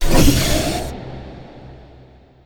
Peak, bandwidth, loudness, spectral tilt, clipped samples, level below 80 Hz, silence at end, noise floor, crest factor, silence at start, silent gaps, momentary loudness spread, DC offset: 0 dBFS; 19.5 kHz; -18 LUFS; -4.5 dB/octave; under 0.1%; -22 dBFS; 0.75 s; -46 dBFS; 18 dB; 0 s; none; 25 LU; under 0.1%